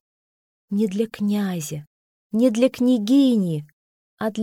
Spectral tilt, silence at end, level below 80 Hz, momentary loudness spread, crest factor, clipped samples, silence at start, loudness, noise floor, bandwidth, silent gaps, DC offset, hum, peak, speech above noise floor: -6.5 dB/octave; 0 s; -66 dBFS; 12 LU; 16 dB; under 0.1%; 0.7 s; -21 LUFS; under -90 dBFS; 16.5 kHz; 1.87-2.30 s, 3.73-4.17 s; under 0.1%; none; -6 dBFS; over 70 dB